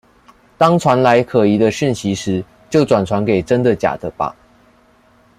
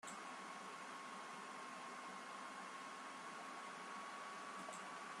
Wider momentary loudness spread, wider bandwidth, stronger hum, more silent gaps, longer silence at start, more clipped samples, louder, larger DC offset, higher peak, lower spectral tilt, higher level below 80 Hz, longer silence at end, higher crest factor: first, 10 LU vs 1 LU; first, 15 kHz vs 13 kHz; neither; neither; first, 0.6 s vs 0.05 s; neither; first, -16 LUFS vs -51 LUFS; neither; first, 0 dBFS vs -38 dBFS; first, -6.5 dB/octave vs -2 dB/octave; first, -50 dBFS vs under -90 dBFS; first, 1.05 s vs 0 s; about the same, 16 dB vs 14 dB